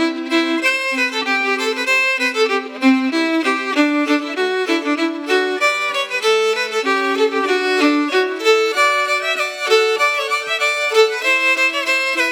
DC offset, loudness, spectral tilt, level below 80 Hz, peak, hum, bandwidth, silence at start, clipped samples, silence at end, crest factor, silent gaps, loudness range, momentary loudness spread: under 0.1%; -16 LUFS; -0.5 dB/octave; -86 dBFS; -2 dBFS; none; 18.5 kHz; 0 s; under 0.1%; 0 s; 16 dB; none; 2 LU; 4 LU